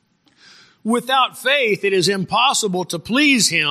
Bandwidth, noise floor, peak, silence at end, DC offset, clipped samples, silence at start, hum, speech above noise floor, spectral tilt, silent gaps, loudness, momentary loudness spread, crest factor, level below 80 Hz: 15.5 kHz; -53 dBFS; -2 dBFS; 0 s; under 0.1%; under 0.1%; 0.85 s; none; 35 dB; -2.5 dB/octave; none; -17 LUFS; 8 LU; 16 dB; -60 dBFS